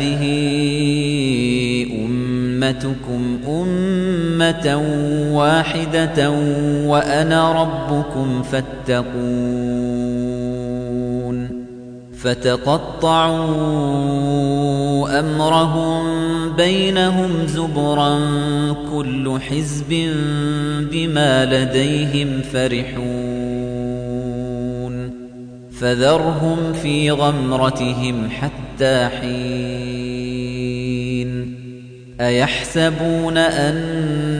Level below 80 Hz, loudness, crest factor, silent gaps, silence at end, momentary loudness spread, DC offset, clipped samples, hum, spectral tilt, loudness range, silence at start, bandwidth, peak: -40 dBFS; -18 LUFS; 16 dB; none; 0 s; 9 LU; under 0.1%; under 0.1%; none; -6 dB/octave; 5 LU; 0 s; 10 kHz; -4 dBFS